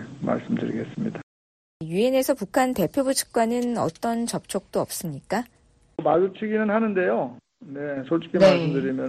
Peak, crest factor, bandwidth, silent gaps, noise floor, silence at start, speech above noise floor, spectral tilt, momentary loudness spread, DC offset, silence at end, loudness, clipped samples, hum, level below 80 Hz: -6 dBFS; 18 dB; 14 kHz; 1.23-1.80 s; under -90 dBFS; 0 s; over 67 dB; -5 dB/octave; 10 LU; under 0.1%; 0 s; -24 LUFS; under 0.1%; none; -58 dBFS